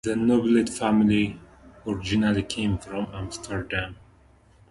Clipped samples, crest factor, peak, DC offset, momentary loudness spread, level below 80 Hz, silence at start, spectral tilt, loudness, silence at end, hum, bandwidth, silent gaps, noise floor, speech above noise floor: under 0.1%; 18 dB; -8 dBFS; under 0.1%; 13 LU; -46 dBFS; 0.05 s; -5.5 dB/octave; -25 LUFS; 0.75 s; none; 11.5 kHz; none; -56 dBFS; 32 dB